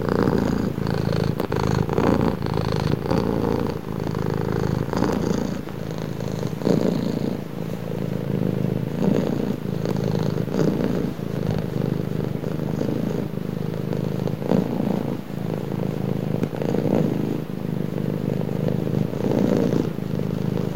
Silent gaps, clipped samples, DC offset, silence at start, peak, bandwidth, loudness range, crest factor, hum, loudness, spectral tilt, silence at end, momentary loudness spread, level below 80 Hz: none; under 0.1%; 1%; 0 s; -4 dBFS; 17 kHz; 3 LU; 18 dB; none; -24 LUFS; -8 dB/octave; 0 s; 7 LU; -42 dBFS